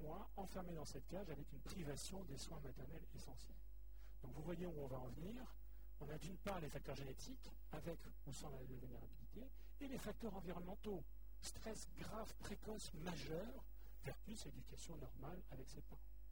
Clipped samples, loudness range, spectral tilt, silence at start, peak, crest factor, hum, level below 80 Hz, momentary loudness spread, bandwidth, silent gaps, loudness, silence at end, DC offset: under 0.1%; 2 LU; -5 dB/octave; 0 s; -34 dBFS; 20 dB; none; -60 dBFS; 10 LU; 19.5 kHz; none; -54 LUFS; 0 s; 0.2%